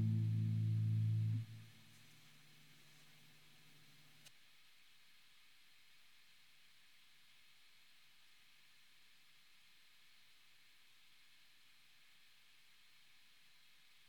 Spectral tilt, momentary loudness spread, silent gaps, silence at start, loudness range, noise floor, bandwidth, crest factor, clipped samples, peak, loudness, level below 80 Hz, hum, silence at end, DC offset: -7 dB/octave; 28 LU; none; 0 s; 23 LU; -70 dBFS; 11.5 kHz; 18 dB; under 0.1%; -30 dBFS; -40 LUFS; -88 dBFS; none; 12.4 s; under 0.1%